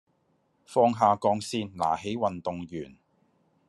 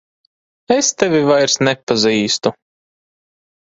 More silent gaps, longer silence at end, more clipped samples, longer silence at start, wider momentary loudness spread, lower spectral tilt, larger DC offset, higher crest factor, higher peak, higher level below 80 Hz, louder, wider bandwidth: second, none vs 1.83-1.87 s; second, 0.75 s vs 1.1 s; neither; about the same, 0.7 s vs 0.7 s; first, 16 LU vs 5 LU; first, -5.5 dB/octave vs -3 dB/octave; neither; about the same, 20 dB vs 18 dB; second, -8 dBFS vs 0 dBFS; second, -68 dBFS vs -58 dBFS; second, -27 LUFS vs -15 LUFS; first, 12.5 kHz vs 8 kHz